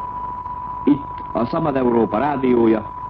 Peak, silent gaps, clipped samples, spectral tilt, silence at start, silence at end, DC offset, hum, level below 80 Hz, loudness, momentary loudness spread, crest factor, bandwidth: -6 dBFS; none; under 0.1%; -10.5 dB/octave; 0 s; 0 s; under 0.1%; none; -44 dBFS; -20 LUFS; 12 LU; 14 dB; 5.2 kHz